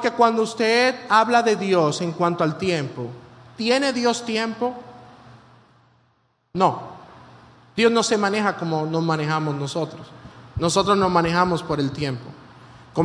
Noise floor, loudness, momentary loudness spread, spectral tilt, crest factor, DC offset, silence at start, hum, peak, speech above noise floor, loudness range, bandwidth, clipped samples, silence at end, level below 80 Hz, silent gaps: -65 dBFS; -21 LUFS; 16 LU; -5 dB/octave; 20 dB; under 0.1%; 0 s; none; -4 dBFS; 44 dB; 6 LU; 10.5 kHz; under 0.1%; 0 s; -54 dBFS; none